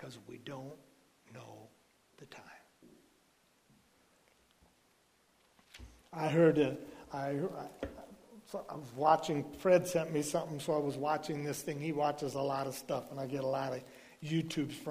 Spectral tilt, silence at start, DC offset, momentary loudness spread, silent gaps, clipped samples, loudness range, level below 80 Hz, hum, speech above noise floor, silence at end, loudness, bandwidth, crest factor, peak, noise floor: -5.5 dB/octave; 0 s; under 0.1%; 25 LU; none; under 0.1%; 4 LU; -68 dBFS; none; 36 dB; 0 s; -35 LUFS; 15.5 kHz; 24 dB; -14 dBFS; -71 dBFS